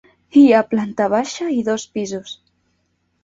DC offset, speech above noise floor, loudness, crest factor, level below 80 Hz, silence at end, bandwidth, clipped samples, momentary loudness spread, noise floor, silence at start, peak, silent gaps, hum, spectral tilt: under 0.1%; 51 dB; -17 LUFS; 16 dB; -62 dBFS; 0.9 s; 7.8 kHz; under 0.1%; 17 LU; -67 dBFS; 0.35 s; -2 dBFS; none; none; -5 dB/octave